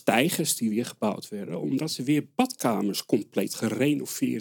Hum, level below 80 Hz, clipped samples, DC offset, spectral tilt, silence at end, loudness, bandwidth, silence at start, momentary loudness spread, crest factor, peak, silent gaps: none; -78 dBFS; under 0.1%; under 0.1%; -4.5 dB/octave; 0 s; -27 LUFS; 18 kHz; 0.05 s; 6 LU; 20 dB; -6 dBFS; none